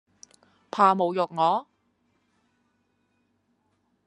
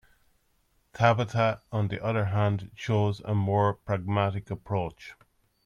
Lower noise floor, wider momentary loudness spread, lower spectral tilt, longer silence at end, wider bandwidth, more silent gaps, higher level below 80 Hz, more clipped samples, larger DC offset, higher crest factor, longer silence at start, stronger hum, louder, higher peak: about the same, -72 dBFS vs -69 dBFS; about the same, 9 LU vs 9 LU; second, -6 dB/octave vs -7.5 dB/octave; first, 2.45 s vs 0.55 s; first, 11 kHz vs 7.2 kHz; neither; second, -82 dBFS vs -58 dBFS; neither; neither; about the same, 22 dB vs 20 dB; second, 0.75 s vs 0.95 s; neither; first, -24 LUFS vs -28 LUFS; about the same, -6 dBFS vs -8 dBFS